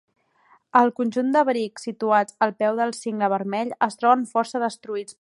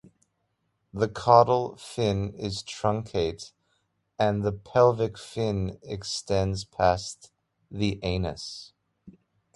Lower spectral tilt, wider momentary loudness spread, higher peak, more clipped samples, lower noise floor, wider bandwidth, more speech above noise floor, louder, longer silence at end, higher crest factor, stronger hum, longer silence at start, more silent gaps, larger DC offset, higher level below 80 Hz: about the same, -5 dB/octave vs -5.5 dB/octave; second, 8 LU vs 17 LU; about the same, -4 dBFS vs -4 dBFS; neither; second, -60 dBFS vs -76 dBFS; about the same, 11.5 kHz vs 11.5 kHz; second, 37 dB vs 50 dB; first, -23 LUFS vs -26 LUFS; second, 0.1 s vs 0.45 s; about the same, 20 dB vs 24 dB; neither; second, 0.75 s vs 0.95 s; neither; neither; second, -80 dBFS vs -48 dBFS